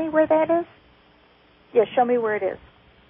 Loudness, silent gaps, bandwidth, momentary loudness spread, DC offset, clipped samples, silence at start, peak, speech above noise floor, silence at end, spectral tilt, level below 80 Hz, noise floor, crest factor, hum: -22 LUFS; none; 3.8 kHz; 12 LU; under 0.1%; under 0.1%; 0 s; -8 dBFS; 35 dB; 0.5 s; -10 dB/octave; -60 dBFS; -56 dBFS; 16 dB; none